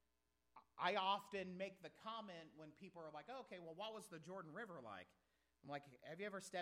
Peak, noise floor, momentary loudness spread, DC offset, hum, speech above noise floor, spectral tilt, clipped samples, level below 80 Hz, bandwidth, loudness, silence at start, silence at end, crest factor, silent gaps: -28 dBFS; -87 dBFS; 17 LU; under 0.1%; none; 37 dB; -4 dB/octave; under 0.1%; -90 dBFS; 15.5 kHz; -50 LUFS; 0.55 s; 0 s; 24 dB; none